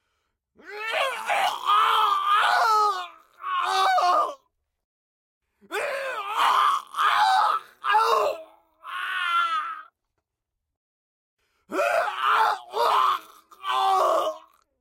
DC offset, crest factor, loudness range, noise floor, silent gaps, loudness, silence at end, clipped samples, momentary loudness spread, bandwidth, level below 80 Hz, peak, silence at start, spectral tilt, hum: under 0.1%; 16 dB; 6 LU; -84 dBFS; 4.84-5.41 s, 10.77-11.37 s; -23 LUFS; 0.4 s; under 0.1%; 13 LU; 16.5 kHz; -82 dBFS; -8 dBFS; 0.65 s; 0 dB/octave; none